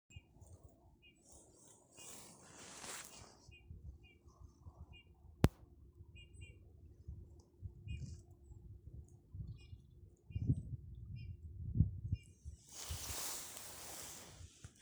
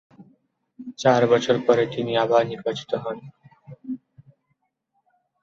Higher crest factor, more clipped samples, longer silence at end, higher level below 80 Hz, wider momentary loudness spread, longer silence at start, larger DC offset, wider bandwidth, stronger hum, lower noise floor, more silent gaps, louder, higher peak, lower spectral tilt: first, 36 dB vs 20 dB; neither; second, 0 s vs 1.45 s; first, -54 dBFS vs -66 dBFS; first, 24 LU vs 18 LU; about the same, 0.1 s vs 0.2 s; neither; first, over 20 kHz vs 7.4 kHz; neither; second, -67 dBFS vs -73 dBFS; neither; second, -46 LUFS vs -21 LUFS; second, -12 dBFS vs -6 dBFS; about the same, -5 dB/octave vs -5.5 dB/octave